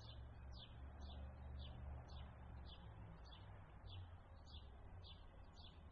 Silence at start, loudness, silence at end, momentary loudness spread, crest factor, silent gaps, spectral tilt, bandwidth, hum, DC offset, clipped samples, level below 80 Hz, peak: 0 s; -59 LUFS; 0 s; 6 LU; 14 dB; none; -5 dB/octave; 6.4 kHz; none; under 0.1%; under 0.1%; -60 dBFS; -44 dBFS